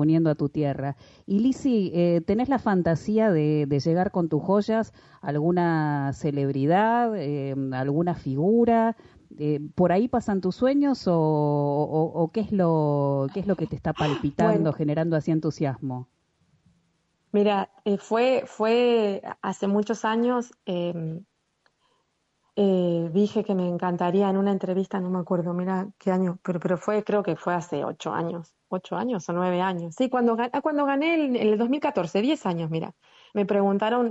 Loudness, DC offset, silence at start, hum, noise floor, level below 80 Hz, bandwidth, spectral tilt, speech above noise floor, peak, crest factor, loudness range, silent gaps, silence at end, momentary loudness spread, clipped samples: -25 LUFS; under 0.1%; 0 s; none; -72 dBFS; -58 dBFS; 8 kHz; -7.5 dB/octave; 48 dB; -8 dBFS; 16 dB; 4 LU; none; 0 s; 8 LU; under 0.1%